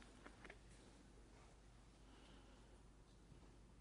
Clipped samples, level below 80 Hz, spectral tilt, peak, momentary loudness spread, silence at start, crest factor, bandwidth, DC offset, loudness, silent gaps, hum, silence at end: under 0.1%; -68 dBFS; -4.5 dB/octave; -42 dBFS; 6 LU; 0 s; 22 dB; 10.5 kHz; under 0.1%; -66 LUFS; none; none; 0 s